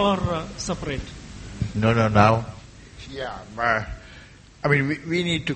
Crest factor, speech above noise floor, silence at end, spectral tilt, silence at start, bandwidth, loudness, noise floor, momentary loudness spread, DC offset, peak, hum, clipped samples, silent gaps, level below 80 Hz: 24 dB; 24 dB; 0 s; -6 dB/octave; 0 s; 8.8 kHz; -23 LUFS; -46 dBFS; 21 LU; under 0.1%; 0 dBFS; none; under 0.1%; none; -42 dBFS